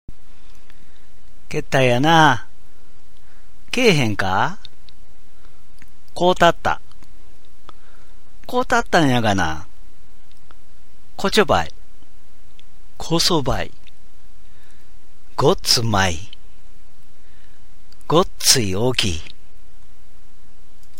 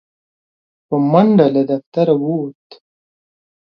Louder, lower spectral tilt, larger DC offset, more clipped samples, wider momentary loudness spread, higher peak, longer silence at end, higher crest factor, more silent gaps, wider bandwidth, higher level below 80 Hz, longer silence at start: second, -18 LUFS vs -15 LUFS; second, -3.5 dB/octave vs -10.5 dB/octave; first, 9% vs under 0.1%; neither; first, 16 LU vs 11 LU; about the same, 0 dBFS vs 0 dBFS; first, 1.7 s vs 1.1 s; first, 22 dB vs 16 dB; second, none vs 1.86-1.92 s; first, 16.5 kHz vs 5.8 kHz; first, -42 dBFS vs -62 dBFS; first, 1.5 s vs 0.9 s